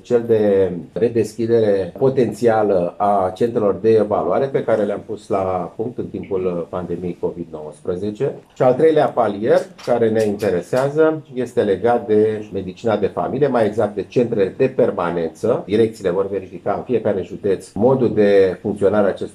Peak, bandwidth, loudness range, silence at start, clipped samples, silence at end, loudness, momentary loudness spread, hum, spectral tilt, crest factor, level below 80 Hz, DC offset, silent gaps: -2 dBFS; 12 kHz; 4 LU; 0.05 s; under 0.1%; 0.05 s; -18 LUFS; 9 LU; none; -7.5 dB/octave; 16 dB; -60 dBFS; under 0.1%; none